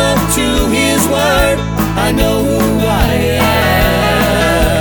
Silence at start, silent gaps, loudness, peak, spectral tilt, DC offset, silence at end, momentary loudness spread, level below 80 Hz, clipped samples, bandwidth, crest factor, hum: 0 s; none; -12 LUFS; 0 dBFS; -4.5 dB/octave; under 0.1%; 0 s; 2 LU; -20 dBFS; under 0.1%; 19.5 kHz; 12 dB; none